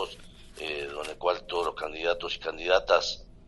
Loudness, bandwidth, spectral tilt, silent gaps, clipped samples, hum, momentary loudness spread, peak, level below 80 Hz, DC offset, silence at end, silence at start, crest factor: -29 LUFS; 11.5 kHz; -2.5 dB/octave; none; under 0.1%; none; 12 LU; -8 dBFS; -52 dBFS; under 0.1%; 0.1 s; 0 s; 22 dB